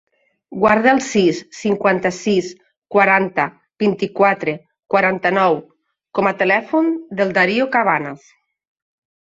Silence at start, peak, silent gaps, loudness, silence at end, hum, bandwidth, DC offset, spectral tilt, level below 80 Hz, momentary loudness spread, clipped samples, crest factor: 0.5 s; 0 dBFS; 2.78-2.82 s; -17 LUFS; 1.1 s; none; 8 kHz; under 0.1%; -5.5 dB/octave; -60 dBFS; 10 LU; under 0.1%; 18 dB